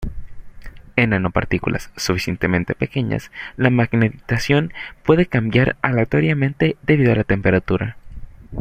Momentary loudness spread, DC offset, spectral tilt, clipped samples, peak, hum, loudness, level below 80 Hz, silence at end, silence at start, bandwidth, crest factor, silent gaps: 8 LU; under 0.1%; -6.5 dB/octave; under 0.1%; 0 dBFS; none; -19 LUFS; -38 dBFS; 0 s; 0 s; 15.5 kHz; 18 dB; none